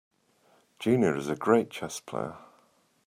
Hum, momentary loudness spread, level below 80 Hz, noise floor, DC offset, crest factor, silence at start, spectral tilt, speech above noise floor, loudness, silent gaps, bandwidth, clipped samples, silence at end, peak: none; 11 LU; -68 dBFS; -66 dBFS; under 0.1%; 22 dB; 0.8 s; -6 dB/octave; 38 dB; -28 LUFS; none; 16 kHz; under 0.1%; 0.7 s; -8 dBFS